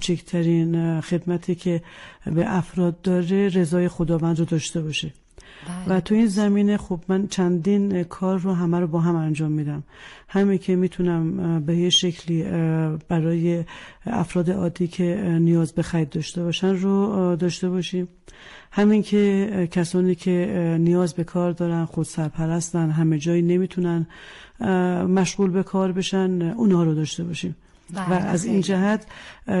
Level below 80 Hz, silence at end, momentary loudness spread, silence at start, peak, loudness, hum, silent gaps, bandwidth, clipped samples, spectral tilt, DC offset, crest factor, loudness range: -50 dBFS; 0 s; 9 LU; 0 s; -8 dBFS; -22 LUFS; none; none; 11.5 kHz; under 0.1%; -6.5 dB/octave; under 0.1%; 12 dB; 2 LU